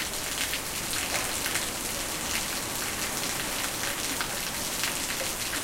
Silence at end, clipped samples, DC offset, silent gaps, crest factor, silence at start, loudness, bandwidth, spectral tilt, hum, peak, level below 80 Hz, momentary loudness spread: 0 s; under 0.1%; under 0.1%; none; 22 dB; 0 s; -29 LUFS; 17 kHz; -1 dB/octave; none; -8 dBFS; -48 dBFS; 2 LU